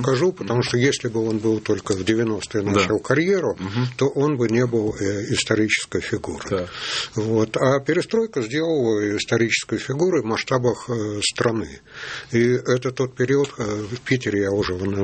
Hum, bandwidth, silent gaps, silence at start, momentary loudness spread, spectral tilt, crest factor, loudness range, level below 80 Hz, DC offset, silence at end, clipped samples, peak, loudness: none; 8.8 kHz; none; 0 s; 6 LU; -5 dB/octave; 18 dB; 2 LU; -54 dBFS; under 0.1%; 0 s; under 0.1%; -2 dBFS; -22 LUFS